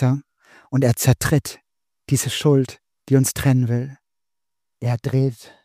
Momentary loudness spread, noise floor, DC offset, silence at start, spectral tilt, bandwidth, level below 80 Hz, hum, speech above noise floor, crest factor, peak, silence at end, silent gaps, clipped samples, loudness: 10 LU; -87 dBFS; under 0.1%; 0 s; -5.5 dB/octave; 15.5 kHz; -46 dBFS; none; 68 dB; 18 dB; -4 dBFS; 0.3 s; none; under 0.1%; -20 LUFS